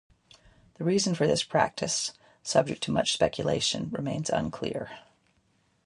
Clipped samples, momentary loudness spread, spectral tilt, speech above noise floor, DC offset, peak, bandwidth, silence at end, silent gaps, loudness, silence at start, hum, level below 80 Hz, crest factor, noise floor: under 0.1%; 9 LU; -4 dB/octave; 41 dB; under 0.1%; -8 dBFS; 11.5 kHz; 0.85 s; none; -28 LUFS; 0.8 s; none; -58 dBFS; 22 dB; -69 dBFS